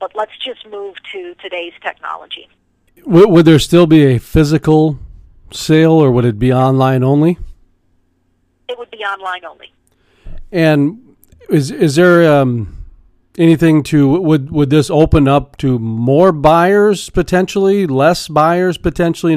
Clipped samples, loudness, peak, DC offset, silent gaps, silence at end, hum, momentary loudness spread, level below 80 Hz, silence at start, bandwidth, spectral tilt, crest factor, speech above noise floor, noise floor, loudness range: under 0.1%; -11 LUFS; 0 dBFS; under 0.1%; none; 0 s; none; 18 LU; -32 dBFS; 0 s; 15.5 kHz; -7 dB/octave; 12 dB; 48 dB; -60 dBFS; 8 LU